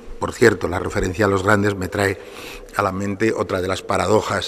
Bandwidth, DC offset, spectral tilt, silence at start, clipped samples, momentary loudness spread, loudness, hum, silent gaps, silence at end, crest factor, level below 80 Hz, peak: 14.5 kHz; under 0.1%; -5.5 dB/octave; 0 s; under 0.1%; 10 LU; -20 LUFS; none; none; 0 s; 20 dB; -42 dBFS; 0 dBFS